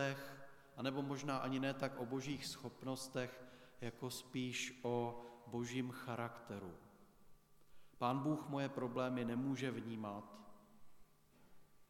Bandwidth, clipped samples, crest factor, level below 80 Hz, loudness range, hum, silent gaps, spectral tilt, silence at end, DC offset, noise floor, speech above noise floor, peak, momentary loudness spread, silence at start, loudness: 16.5 kHz; under 0.1%; 20 dB; -76 dBFS; 3 LU; none; none; -5.5 dB/octave; 0.05 s; under 0.1%; -67 dBFS; 24 dB; -24 dBFS; 14 LU; 0 s; -44 LUFS